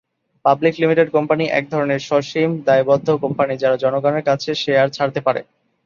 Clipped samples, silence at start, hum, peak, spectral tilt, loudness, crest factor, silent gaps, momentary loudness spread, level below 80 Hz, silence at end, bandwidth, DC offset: under 0.1%; 0.45 s; none; -2 dBFS; -6 dB/octave; -18 LUFS; 16 dB; none; 5 LU; -62 dBFS; 0.45 s; 7.2 kHz; under 0.1%